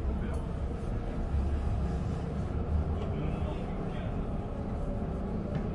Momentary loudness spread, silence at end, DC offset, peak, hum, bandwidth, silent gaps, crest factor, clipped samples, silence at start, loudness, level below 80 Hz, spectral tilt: 4 LU; 0 s; under 0.1%; -20 dBFS; none; 10.5 kHz; none; 12 dB; under 0.1%; 0 s; -35 LUFS; -36 dBFS; -9 dB/octave